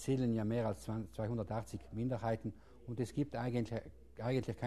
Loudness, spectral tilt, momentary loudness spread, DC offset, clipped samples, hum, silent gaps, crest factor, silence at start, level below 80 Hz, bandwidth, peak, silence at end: -40 LUFS; -7.5 dB/octave; 11 LU; 0.1%; under 0.1%; none; none; 16 dB; 0 s; -60 dBFS; 13 kHz; -24 dBFS; 0 s